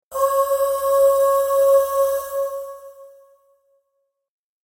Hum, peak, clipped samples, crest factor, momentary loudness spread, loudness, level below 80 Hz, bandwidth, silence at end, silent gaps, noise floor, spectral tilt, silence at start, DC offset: none; -6 dBFS; under 0.1%; 14 dB; 13 LU; -18 LUFS; -58 dBFS; 16.5 kHz; 1.6 s; none; -73 dBFS; -0.5 dB/octave; 0.1 s; under 0.1%